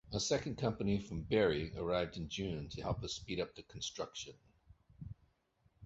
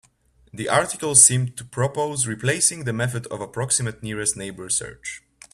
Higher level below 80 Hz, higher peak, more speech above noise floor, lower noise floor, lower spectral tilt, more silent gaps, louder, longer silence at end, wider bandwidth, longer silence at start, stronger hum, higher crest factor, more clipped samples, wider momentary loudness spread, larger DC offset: about the same, -56 dBFS vs -56 dBFS; second, -18 dBFS vs 0 dBFS; about the same, 37 dB vs 36 dB; first, -75 dBFS vs -59 dBFS; first, -4.5 dB/octave vs -3 dB/octave; neither; second, -39 LUFS vs -20 LUFS; second, 0 s vs 0.35 s; second, 8 kHz vs 15 kHz; second, 0.05 s vs 0.55 s; neither; about the same, 20 dB vs 24 dB; neither; about the same, 18 LU vs 18 LU; neither